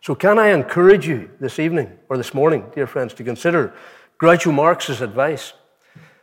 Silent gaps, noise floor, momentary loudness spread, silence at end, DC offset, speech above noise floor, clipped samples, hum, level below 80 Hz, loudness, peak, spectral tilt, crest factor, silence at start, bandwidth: none; -49 dBFS; 13 LU; 0.75 s; under 0.1%; 32 dB; under 0.1%; none; -58 dBFS; -17 LUFS; -2 dBFS; -6 dB/octave; 16 dB; 0.05 s; 16.5 kHz